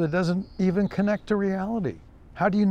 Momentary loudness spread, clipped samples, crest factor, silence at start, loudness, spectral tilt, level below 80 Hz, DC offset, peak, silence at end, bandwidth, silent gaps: 5 LU; under 0.1%; 16 dB; 0 s; -26 LUFS; -8 dB/octave; -50 dBFS; under 0.1%; -10 dBFS; 0 s; 9 kHz; none